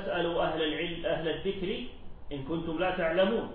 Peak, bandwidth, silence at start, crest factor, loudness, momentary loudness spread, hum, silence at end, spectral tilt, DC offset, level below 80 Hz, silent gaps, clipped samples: -16 dBFS; 4.7 kHz; 0 s; 16 dB; -31 LUFS; 11 LU; none; 0 s; -9 dB/octave; under 0.1%; -46 dBFS; none; under 0.1%